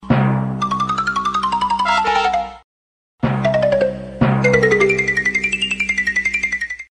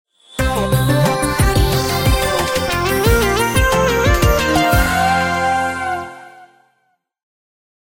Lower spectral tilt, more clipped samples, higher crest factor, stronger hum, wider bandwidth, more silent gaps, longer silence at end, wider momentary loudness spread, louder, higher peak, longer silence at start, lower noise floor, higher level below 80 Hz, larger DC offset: about the same, -5.5 dB/octave vs -4.5 dB/octave; neither; about the same, 18 dB vs 16 dB; neither; second, 10.5 kHz vs 17 kHz; first, 2.64-3.18 s vs none; second, 0.15 s vs 1.45 s; about the same, 7 LU vs 6 LU; about the same, -17 LUFS vs -15 LUFS; about the same, 0 dBFS vs 0 dBFS; second, 0 s vs 0.35 s; first, under -90 dBFS vs -65 dBFS; second, -42 dBFS vs -24 dBFS; neither